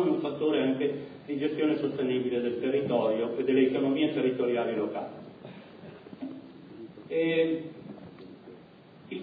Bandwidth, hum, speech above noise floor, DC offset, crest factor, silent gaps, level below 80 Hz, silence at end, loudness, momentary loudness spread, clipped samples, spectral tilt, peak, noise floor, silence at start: 5 kHz; none; 24 dB; under 0.1%; 18 dB; none; -74 dBFS; 0 s; -29 LUFS; 21 LU; under 0.1%; -9.5 dB/octave; -12 dBFS; -52 dBFS; 0 s